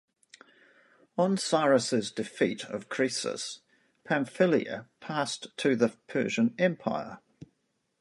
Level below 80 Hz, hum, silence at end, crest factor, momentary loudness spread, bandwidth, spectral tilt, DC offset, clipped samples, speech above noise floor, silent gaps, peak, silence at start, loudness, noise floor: -74 dBFS; none; 0.55 s; 20 dB; 13 LU; 11.5 kHz; -4.5 dB/octave; under 0.1%; under 0.1%; 48 dB; none; -10 dBFS; 1.15 s; -29 LUFS; -77 dBFS